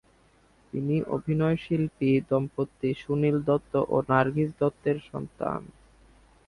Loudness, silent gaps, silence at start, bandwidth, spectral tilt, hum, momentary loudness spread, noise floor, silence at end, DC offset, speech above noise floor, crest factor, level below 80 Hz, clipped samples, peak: -27 LUFS; none; 0.75 s; 11 kHz; -9 dB/octave; none; 9 LU; -61 dBFS; 0.8 s; under 0.1%; 35 dB; 20 dB; -56 dBFS; under 0.1%; -8 dBFS